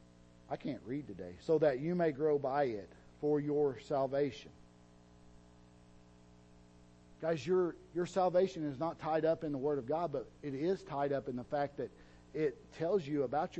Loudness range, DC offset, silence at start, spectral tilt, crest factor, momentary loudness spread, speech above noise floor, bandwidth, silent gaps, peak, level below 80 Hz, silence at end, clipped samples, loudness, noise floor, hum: 7 LU; under 0.1%; 0.5 s; -7.5 dB/octave; 18 dB; 11 LU; 26 dB; 8.4 kHz; none; -18 dBFS; -66 dBFS; 0 s; under 0.1%; -36 LUFS; -61 dBFS; 60 Hz at -65 dBFS